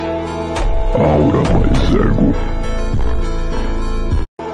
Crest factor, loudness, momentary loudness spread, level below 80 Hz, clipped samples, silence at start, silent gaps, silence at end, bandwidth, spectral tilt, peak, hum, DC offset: 12 dB; -17 LUFS; 9 LU; -18 dBFS; under 0.1%; 0 s; 4.28-4.37 s; 0 s; 9.8 kHz; -7.5 dB/octave; -2 dBFS; none; 1%